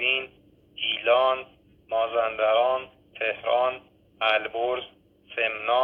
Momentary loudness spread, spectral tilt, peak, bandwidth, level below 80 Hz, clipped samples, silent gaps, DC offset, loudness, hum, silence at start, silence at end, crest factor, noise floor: 15 LU; -5 dB/octave; -10 dBFS; 5 kHz; -66 dBFS; under 0.1%; none; under 0.1%; -25 LUFS; none; 0 s; 0 s; 18 dB; -57 dBFS